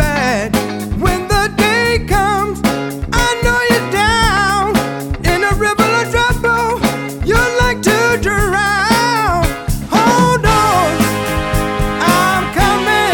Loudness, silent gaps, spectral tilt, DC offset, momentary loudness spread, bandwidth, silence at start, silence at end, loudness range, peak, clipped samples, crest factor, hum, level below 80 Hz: -13 LUFS; none; -4.5 dB/octave; under 0.1%; 6 LU; 17 kHz; 0 s; 0 s; 1 LU; 0 dBFS; under 0.1%; 14 dB; none; -24 dBFS